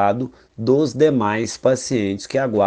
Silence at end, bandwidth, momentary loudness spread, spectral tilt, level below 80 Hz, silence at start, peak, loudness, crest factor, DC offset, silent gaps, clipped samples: 0 s; 10 kHz; 9 LU; -5.5 dB/octave; -56 dBFS; 0 s; -4 dBFS; -19 LUFS; 16 dB; under 0.1%; none; under 0.1%